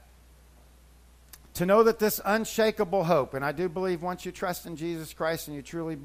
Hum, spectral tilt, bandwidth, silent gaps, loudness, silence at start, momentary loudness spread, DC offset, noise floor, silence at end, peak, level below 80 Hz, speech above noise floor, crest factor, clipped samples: none; -5 dB/octave; 15.5 kHz; none; -28 LUFS; 1.55 s; 13 LU; under 0.1%; -55 dBFS; 0 s; -8 dBFS; -54 dBFS; 28 dB; 20 dB; under 0.1%